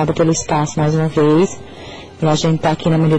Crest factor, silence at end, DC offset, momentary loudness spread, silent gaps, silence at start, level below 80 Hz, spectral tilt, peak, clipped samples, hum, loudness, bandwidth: 12 dB; 0 s; under 0.1%; 19 LU; none; 0 s; -42 dBFS; -6 dB/octave; -4 dBFS; under 0.1%; none; -16 LUFS; 8.8 kHz